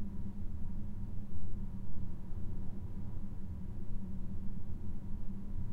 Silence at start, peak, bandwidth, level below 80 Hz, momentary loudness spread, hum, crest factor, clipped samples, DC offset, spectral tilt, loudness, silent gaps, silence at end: 0 s; -22 dBFS; 2 kHz; -42 dBFS; 1 LU; none; 10 dB; under 0.1%; under 0.1%; -9.5 dB/octave; -46 LUFS; none; 0 s